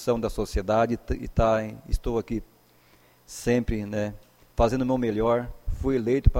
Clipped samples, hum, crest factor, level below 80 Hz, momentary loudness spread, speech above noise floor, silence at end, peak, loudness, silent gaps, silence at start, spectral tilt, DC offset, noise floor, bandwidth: under 0.1%; none; 22 dB; -32 dBFS; 10 LU; 34 dB; 0 s; -4 dBFS; -27 LUFS; none; 0 s; -7 dB/octave; under 0.1%; -58 dBFS; 16.5 kHz